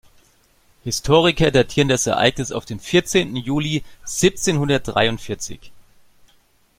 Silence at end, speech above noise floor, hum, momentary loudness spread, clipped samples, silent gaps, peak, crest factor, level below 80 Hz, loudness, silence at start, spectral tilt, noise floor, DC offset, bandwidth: 1 s; 39 dB; none; 12 LU; under 0.1%; none; 0 dBFS; 20 dB; -40 dBFS; -19 LUFS; 0.85 s; -4 dB/octave; -58 dBFS; under 0.1%; 16.5 kHz